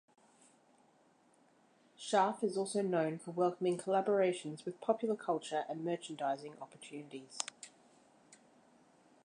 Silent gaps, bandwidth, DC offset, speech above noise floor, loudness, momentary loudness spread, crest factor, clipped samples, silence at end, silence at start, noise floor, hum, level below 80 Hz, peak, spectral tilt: none; 11 kHz; under 0.1%; 33 dB; -36 LUFS; 16 LU; 26 dB; under 0.1%; 0.9 s; 2 s; -69 dBFS; none; under -90 dBFS; -12 dBFS; -5 dB/octave